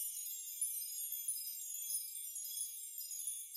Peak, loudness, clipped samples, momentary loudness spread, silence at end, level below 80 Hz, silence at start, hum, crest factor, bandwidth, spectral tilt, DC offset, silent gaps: -28 dBFS; -41 LUFS; under 0.1%; 4 LU; 0 s; under -90 dBFS; 0 s; none; 16 dB; 16 kHz; 9 dB/octave; under 0.1%; none